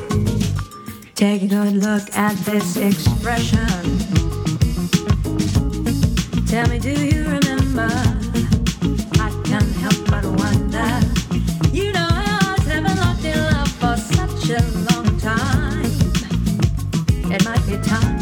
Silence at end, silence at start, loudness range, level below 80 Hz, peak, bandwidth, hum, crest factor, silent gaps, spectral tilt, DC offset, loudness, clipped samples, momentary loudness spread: 0 s; 0 s; 1 LU; -26 dBFS; 0 dBFS; 18.5 kHz; none; 18 dB; none; -5.5 dB/octave; under 0.1%; -19 LUFS; under 0.1%; 3 LU